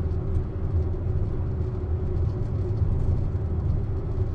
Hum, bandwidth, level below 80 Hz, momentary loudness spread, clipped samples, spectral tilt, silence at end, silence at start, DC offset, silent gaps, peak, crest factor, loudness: none; 4.6 kHz; -30 dBFS; 3 LU; under 0.1%; -11 dB/octave; 0 s; 0 s; under 0.1%; none; -12 dBFS; 12 dB; -28 LUFS